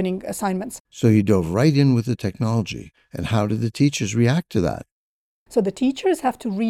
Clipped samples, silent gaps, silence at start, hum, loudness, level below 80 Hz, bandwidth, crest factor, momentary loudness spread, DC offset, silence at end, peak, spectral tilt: under 0.1%; 0.80-0.85 s, 4.91-5.46 s; 0 s; none; -21 LUFS; -50 dBFS; 14.5 kHz; 16 dB; 11 LU; under 0.1%; 0 s; -4 dBFS; -6.5 dB/octave